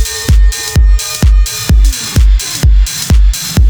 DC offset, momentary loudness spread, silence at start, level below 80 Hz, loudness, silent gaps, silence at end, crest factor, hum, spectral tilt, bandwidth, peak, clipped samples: under 0.1%; 1 LU; 0 s; -8 dBFS; -11 LUFS; none; 0 s; 8 dB; none; -4 dB/octave; over 20 kHz; 0 dBFS; under 0.1%